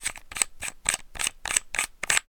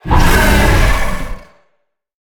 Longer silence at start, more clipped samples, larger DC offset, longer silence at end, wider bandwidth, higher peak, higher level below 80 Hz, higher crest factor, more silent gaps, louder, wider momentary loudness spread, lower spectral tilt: about the same, 0 s vs 0.05 s; neither; neither; second, 0.15 s vs 0.85 s; about the same, over 20 kHz vs over 20 kHz; about the same, 0 dBFS vs 0 dBFS; second, -48 dBFS vs -14 dBFS; first, 30 dB vs 12 dB; neither; second, -27 LUFS vs -12 LUFS; second, 5 LU vs 14 LU; second, 1.5 dB/octave vs -5 dB/octave